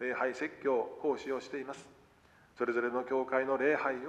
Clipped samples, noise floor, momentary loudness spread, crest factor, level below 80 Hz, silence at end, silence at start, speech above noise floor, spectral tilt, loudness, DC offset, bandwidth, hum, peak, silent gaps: under 0.1%; -63 dBFS; 11 LU; 18 dB; -74 dBFS; 0 s; 0 s; 30 dB; -5 dB/octave; -34 LUFS; under 0.1%; 9.8 kHz; none; -16 dBFS; none